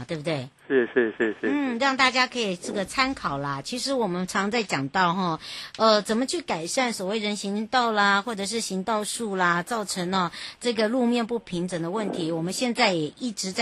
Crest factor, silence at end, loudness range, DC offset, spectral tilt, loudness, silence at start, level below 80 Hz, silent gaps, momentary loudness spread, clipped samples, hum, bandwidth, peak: 20 dB; 0 s; 2 LU; under 0.1%; -4 dB/octave; -25 LUFS; 0 s; -60 dBFS; none; 8 LU; under 0.1%; none; 12.5 kHz; -6 dBFS